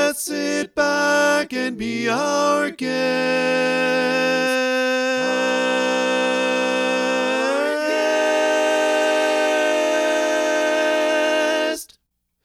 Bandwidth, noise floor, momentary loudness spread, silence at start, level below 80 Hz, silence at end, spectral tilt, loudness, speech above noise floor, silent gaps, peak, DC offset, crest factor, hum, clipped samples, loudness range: 15.5 kHz; -67 dBFS; 4 LU; 0 s; -64 dBFS; 0.6 s; -2.5 dB/octave; -19 LUFS; 48 dB; none; -4 dBFS; under 0.1%; 14 dB; none; under 0.1%; 1 LU